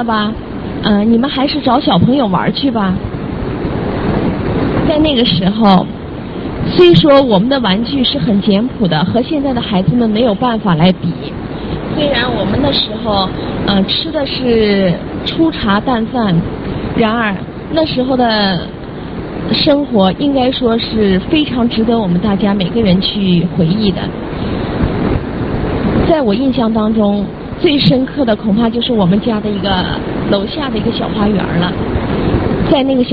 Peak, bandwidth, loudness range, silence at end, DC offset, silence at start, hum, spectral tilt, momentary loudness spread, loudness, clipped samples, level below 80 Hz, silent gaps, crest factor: 0 dBFS; 5.4 kHz; 4 LU; 0 s; 0.3%; 0 s; none; -9.5 dB/octave; 8 LU; -13 LUFS; under 0.1%; -30 dBFS; none; 12 dB